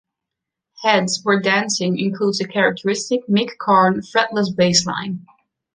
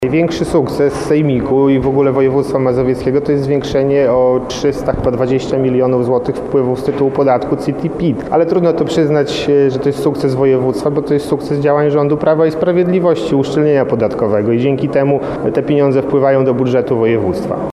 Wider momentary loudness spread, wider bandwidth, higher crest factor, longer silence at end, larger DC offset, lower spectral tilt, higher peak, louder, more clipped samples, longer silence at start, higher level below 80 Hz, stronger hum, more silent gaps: first, 7 LU vs 4 LU; second, 10 kHz vs 12.5 kHz; first, 18 dB vs 12 dB; first, 0.55 s vs 0 s; neither; second, -4 dB/octave vs -7.5 dB/octave; about the same, -2 dBFS vs -2 dBFS; second, -18 LUFS vs -13 LUFS; neither; first, 0.8 s vs 0 s; second, -60 dBFS vs -38 dBFS; neither; neither